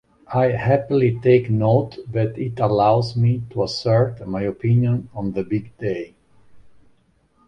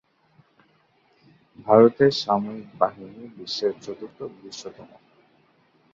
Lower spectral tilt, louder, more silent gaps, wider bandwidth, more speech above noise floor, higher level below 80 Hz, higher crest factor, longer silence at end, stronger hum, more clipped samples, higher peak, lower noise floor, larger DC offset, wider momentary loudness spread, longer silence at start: first, -8.5 dB/octave vs -6 dB/octave; about the same, -20 LUFS vs -21 LUFS; neither; first, 8.6 kHz vs 7.6 kHz; about the same, 41 dB vs 40 dB; first, -50 dBFS vs -66 dBFS; second, 16 dB vs 22 dB; second, 0.8 s vs 1.1 s; neither; neither; about the same, -4 dBFS vs -2 dBFS; about the same, -60 dBFS vs -63 dBFS; neither; second, 10 LU vs 23 LU; second, 0.3 s vs 1.65 s